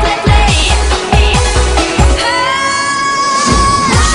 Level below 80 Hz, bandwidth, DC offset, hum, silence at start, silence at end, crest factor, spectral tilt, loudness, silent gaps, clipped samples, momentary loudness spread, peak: -14 dBFS; 11 kHz; under 0.1%; none; 0 s; 0 s; 10 dB; -3.5 dB/octave; -10 LUFS; none; under 0.1%; 3 LU; 0 dBFS